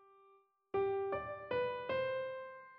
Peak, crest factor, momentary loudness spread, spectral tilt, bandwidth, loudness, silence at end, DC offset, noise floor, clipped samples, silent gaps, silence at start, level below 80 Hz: -26 dBFS; 14 dB; 6 LU; -3.5 dB/octave; 5.4 kHz; -39 LUFS; 0 s; under 0.1%; -69 dBFS; under 0.1%; none; 0.75 s; -72 dBFS